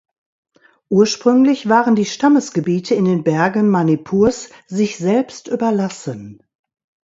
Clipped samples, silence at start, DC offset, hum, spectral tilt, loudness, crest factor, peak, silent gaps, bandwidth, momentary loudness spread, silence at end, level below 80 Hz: under 0.1%; 0.9 s; under 0.1%; none; -6 dB/octave; -16 LUFS; 16 dB; 0 dBFS; none; 8 kHz; 10 LU; 0.7 s; -54 dBFS